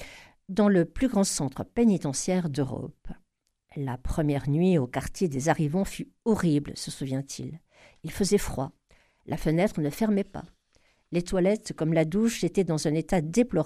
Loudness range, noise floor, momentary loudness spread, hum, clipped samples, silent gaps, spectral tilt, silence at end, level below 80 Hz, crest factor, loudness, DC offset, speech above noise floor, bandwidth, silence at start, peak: 3 LU; -66 dBFS; 13 LU; none; under 0.1%; none; -6 dB/octave; 0 s; -46 dBFS; 18 dB; -27 LUFS; under 0.1%; 40 dB; 14.5 kHz; 0 s; -10 dBFS